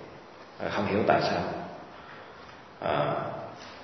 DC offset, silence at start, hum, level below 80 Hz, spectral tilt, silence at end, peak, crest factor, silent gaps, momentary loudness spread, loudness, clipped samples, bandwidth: under 0.1%; 0 s; none; -58 dBFS; -6.5 dB/octave; 0 s; -6 dBFS; 26 dB; none; 22 LU; -29 LUFS; under 0.1%; 6.4 kHz